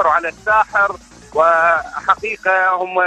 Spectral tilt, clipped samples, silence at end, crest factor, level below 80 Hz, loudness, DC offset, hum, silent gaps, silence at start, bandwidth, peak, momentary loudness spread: -3.5 dB/octave; under 0.1%; 0 s; 14 dB; -50 dBFS; -15 LUFS; under 0.1%; none; none; 0 s; 9.4 kHz; -2 dBFS; 6 LU